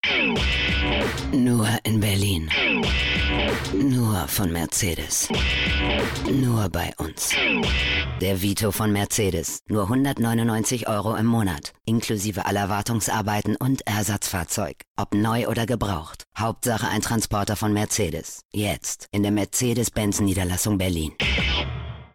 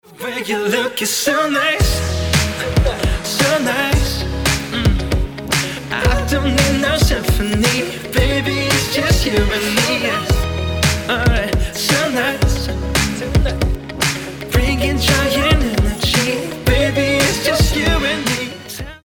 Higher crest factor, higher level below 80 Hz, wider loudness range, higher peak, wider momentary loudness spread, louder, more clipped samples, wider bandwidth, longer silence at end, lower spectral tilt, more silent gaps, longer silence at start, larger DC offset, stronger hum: about the same, 12 dB vs 14 dB; second, -36 dBFS vs -22 dBFS; about the same, 3 LU vs 2 LU; second, -12 dBFS vs -2 dBFS; about the same, 6 LU vs 5 LU; second, -23 LUFS vs -16 LUFS; neither; second, 18 kHz vs over 20 kHz; about the same, 0.1 s vs 0.1 s; about the same, -4 dB/octave vs -4 dB/octave; first, 14.87-14.95 s, 18.45-18.49 s vs none; about the same, 0.05 s vs 0.1 s; neither; neither